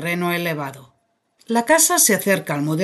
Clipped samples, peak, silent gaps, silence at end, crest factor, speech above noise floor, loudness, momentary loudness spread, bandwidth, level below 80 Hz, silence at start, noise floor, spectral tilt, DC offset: under 0.1%; -2 dBFS; none; 0 s; 18 dB; 47 dB; -17 LUFS; 12 LU; 12.5 kHz; -66 dBFS; 0 s; -66 dBFS; -3 dB/octave; under 0.1%